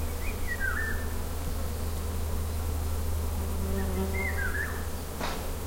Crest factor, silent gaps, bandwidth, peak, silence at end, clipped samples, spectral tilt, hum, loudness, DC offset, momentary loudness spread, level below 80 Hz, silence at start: 14 dB; none; 16.5 kHz; -18 dBFS; 0 s; under 0.1%; -5 dB/octave; none; -33 LUFS; 0.4%; 5 LU; -34 dBFS; 0 s